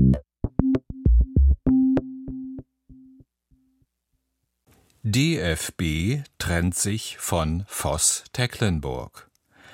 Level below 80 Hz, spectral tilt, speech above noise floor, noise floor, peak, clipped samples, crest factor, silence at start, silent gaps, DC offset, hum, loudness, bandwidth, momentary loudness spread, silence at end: -30 dBFS; -5 dB/octave; 52 dB; -77 dBFS; -4 dBFS; under 0.1%; 20 dB; 0 s; none; under 0.1%; none; -24 LUFS; 16.5 kHz; 15 LU; 0.55 s